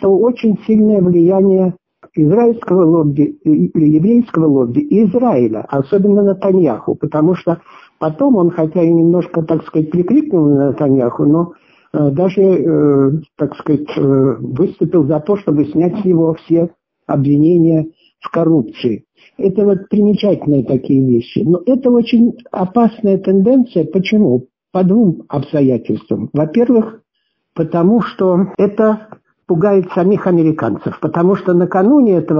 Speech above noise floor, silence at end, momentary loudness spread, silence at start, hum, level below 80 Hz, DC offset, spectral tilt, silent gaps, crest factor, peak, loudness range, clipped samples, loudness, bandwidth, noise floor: 57 dB; 0 s; 8 LU; 0 s; none; -52 dBFS; under 0.1%; -10.5 dB/octave; none; 10 dB; -2 dBFS; 3 LU; under 0.1%; -13 LUFS; 6 kHz; -69 dBFS